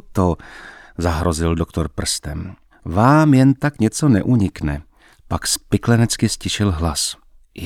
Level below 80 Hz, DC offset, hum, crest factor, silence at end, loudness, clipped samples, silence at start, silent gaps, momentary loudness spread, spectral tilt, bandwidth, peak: -34 dBFS; under 0.1%; none; 18 dB; 0 s; -18 LUFS; under 0.1%; 0.1 s; none; 17 LU; -5.5 dB/octave; 16.5 kHz; -2 dBFS